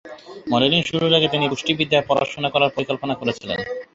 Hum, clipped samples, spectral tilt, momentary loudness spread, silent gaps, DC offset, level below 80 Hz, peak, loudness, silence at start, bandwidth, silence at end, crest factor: none; under 0.1%; -5 dB/octave; 10 LU; none; under 0.1%; -54 dBFS; -2 dBFS; -20 LUFS; 0.05 s; 8 kHz; 0.1 s; 18 dB